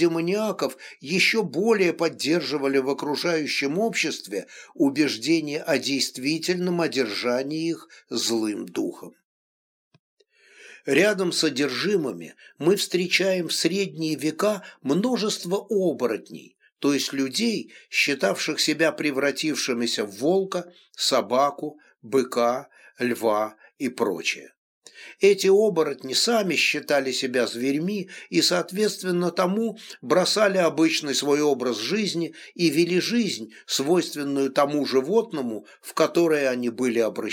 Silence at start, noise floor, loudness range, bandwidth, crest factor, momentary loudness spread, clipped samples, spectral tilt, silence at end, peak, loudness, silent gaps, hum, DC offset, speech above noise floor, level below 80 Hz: 0 s; -52 dBFS; 4 LU; 18 kHz; 18 dB; 10 LU; under 0.1%; -3.5 dB/octave; 0 s; -6 dBFS; -24 LUFS; 9.24-9.91 s, 9.99-10.17 s, 16.72-16.76 s, 24.57-24.82 s; none; under 0.1%; 29 dB; -82 dBFS